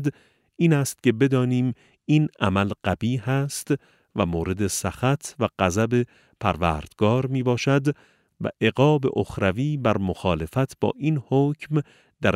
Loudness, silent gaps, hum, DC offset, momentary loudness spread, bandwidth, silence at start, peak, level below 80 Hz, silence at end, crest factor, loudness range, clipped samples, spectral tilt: -24 LUFS; none; none; under 0.1%; 7 LU; 16 kHz; 0 s; -4 dBFS; -48 dBFS; 0 s; 20 dB; 2 LU; under 0.1%; -6 dB/octave